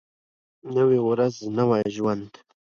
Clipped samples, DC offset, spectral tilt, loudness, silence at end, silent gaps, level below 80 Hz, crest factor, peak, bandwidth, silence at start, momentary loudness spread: under 0.1%; under 0.1%; -7.5 dB/octave; -23 LUFS; 0.45 s; none; -64 dBFS; 16 dB; -10 dBFS; 7.2 kHz; 0.65 s; 7 LU